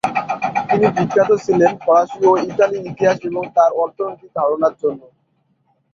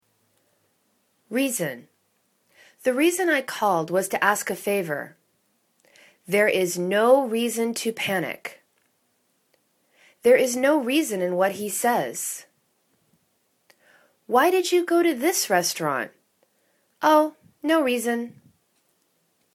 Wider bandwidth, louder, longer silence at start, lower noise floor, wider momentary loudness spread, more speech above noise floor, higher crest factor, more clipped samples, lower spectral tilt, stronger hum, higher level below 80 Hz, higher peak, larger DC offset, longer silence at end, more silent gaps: second, 7.8 kHz vs 19 kHz; first, -17 LUFS vs -23 LUFS; second, 0.05 s vs 1.3 s; second, -64 dBFS vs -69 dBFS; second, 8 LU vs 11 LU; about the same, 48 dB vs 47 dB; about the same, 16 dB vs 20 dB; neither; first, -6.5 dB/octave vs -3.5 dB/octave; neither; first, -58 dBFS vs -74 dBFS; first, -2 dBFS vs -6 dBFS; neither; second, 0.95 s vs 1.25 s; neither